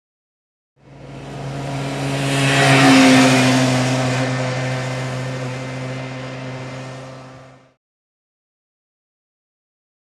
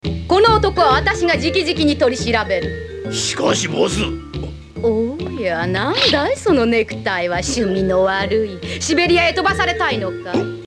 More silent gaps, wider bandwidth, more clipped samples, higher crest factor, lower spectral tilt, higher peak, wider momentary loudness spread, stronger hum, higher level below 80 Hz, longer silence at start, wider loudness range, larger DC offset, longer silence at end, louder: neither; first, 14.5 kHz vs 12 kHz; neither; about the same, 18 dB vs 16 dB; about the same, -5 dB/octave vs -4 dB/octave; about the same, -2 dBFS vs -2 dBFS; first, 22 LU vs 9 LU; neither; second, -52 dBFS vs -36 dBFS; first, 0.9 s vs 0.05 s; first, 18 LU vs 4 LU; neither; first, 2.55 s vs 0 s; about the same, -16 LUFS vs -17 LUFS